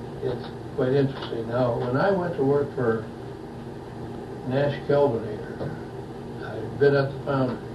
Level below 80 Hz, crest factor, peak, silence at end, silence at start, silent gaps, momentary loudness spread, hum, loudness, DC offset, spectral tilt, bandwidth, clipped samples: -52 dBFS; 18 dB; -8 dBFS; 0 s; 0 s; none; 15 LU; none; -26 LUFS; under 0.1%; -8.5 dB/octave; 12 kHz; under 0.1%